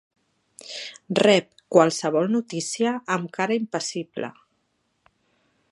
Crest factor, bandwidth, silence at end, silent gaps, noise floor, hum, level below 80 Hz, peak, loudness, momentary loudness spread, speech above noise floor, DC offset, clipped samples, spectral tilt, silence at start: 24 dB; 11.5 kHz; 1.4 s; none; -72 dBFS; none; -74 dBFS; -2 dBFS; -23 LUFS; 16 LU; 49 dB; under 0.1%; under 0.1%; -4.5 dB/octave; 0.65 s